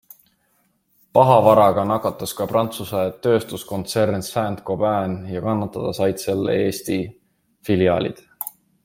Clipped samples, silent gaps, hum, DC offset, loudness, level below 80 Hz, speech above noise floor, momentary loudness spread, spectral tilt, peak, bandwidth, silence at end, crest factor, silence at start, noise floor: under 0.1%; none; none; under 0.1%; -20 LUFS; -56 dBFS; 46 dB; 14 LU; -6 dB/octave; -2 dBFS; 16.5 kHz; 0.35 s; 20 dB; 1.15 s; -65 dBFS